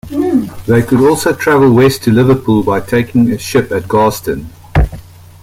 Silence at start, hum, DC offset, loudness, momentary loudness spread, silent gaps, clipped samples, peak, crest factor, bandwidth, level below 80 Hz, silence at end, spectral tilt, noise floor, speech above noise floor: 0.05 s; none; under 0.1%; -12 LUFS; 7 LU; none; under 0.1%; 0 dBFS; 12 dB; 16.5 kHz; -28 dBFS; 0.4 s; -6.5 dB/octave; -32 dBFS; 21 dB